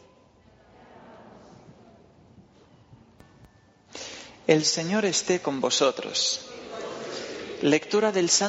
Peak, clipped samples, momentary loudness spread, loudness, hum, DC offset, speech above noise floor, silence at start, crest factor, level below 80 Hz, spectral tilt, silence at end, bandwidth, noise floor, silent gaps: -6 dBFS; under 0.1%; 17 LU; -25 LUFS; none; under 0.1%; 33 dB; 0.95 s; 22 dB; -68 dBFS; -3 dB/octave; 0 s; 8 kHz; -57 dBFS; none